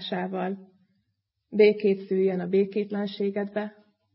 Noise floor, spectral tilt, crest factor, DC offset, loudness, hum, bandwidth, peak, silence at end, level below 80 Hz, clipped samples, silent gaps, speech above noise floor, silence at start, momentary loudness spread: -78 dBFS; -11 dB/octave; 20 dB; under 0.1%; -26 LUFS; none; 5.8 kHz; -6 dBFS; 0.45 s; -78 dBFS; under 0.1%; none; 53 dB; 0 s; 13 LU